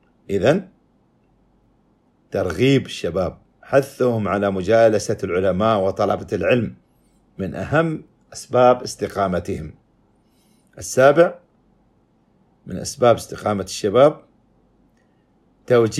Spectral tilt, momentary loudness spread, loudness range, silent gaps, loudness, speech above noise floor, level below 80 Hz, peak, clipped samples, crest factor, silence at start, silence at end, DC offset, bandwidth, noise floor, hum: -5.5 dB/octave; 14 LU; 3 LU; none; -19 LUFS; 42 dB; -52 dBFS; -2 dBFS; under 0.1%; 20 dB; 0.3 s; 0 s; under 0.1%; 14 kHz; -60 dBFS; none